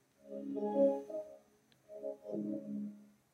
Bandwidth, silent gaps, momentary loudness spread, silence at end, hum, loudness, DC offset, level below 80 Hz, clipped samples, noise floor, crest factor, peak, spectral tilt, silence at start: 8.4 kHz; none; 19 LU; 0.25 s; none; -39 LUFS; under 0.1%; under -90 dBFS; under 0.1%; -69 dBFS; 20 dB; -20 dBFS; -9 dB/octave; 0.25 s